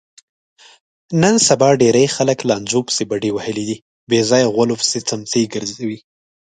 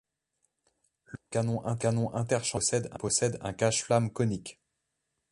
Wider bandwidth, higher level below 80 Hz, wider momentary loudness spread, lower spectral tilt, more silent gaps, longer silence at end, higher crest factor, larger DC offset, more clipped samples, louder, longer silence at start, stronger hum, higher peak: second, 9.6 kHz vs 11.5 kHz; about the same, -58 dBFS vs -60 dBFS; first, 12 LU vs 9 LU; about the same, -4 dB/octave vs -4.5 dB/octave; first, 3.82-4.07 s vs none; second, 0.5 s vs 0.8 s; about the same, 18 dB vs 20 dB; neither; neither; first, -16 LUFS vs -29 LUFS; about the same, 1.1 s vs 1.1 s; neither; first, 0 dBFS vs -10 dBFS